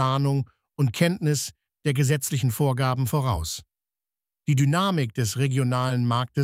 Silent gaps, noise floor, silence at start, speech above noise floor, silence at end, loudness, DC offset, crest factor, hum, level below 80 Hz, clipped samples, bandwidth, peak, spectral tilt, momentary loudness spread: none; under -90 dBFS; 0 s; over 67 dB; 0 s; -24 LUFS; under 0.1%; 18 dB; none; -48 dBFS; under 0.1%; 16 kHz; -6 dBFS; -5.5 dB/octave; 8 LU